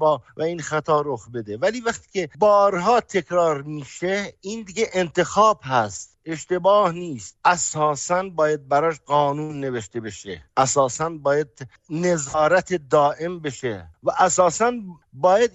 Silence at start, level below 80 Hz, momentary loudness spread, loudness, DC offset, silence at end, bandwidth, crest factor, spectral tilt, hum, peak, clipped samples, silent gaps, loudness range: 0 s; -58 dBFS; 14 LU; -21 LUFS; under 0.1%; 0.05 s; 8.4 kHz; 16 dB; -4 dB/octave; none; -4 dBFS; under 0.1%; none; 2 LU